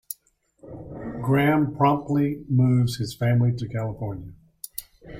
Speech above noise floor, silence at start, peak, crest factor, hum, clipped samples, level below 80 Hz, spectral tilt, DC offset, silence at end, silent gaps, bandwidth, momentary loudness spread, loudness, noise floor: 42 dB; 0.1 s; -6 dBFS; 18 dB; none; under 0.1%; -52 dBFS; -7.5 dB/octave; under 0.1%; 0 s; none; 16.5 kHz; 18 LU; -23 LUFS; -64 dBFS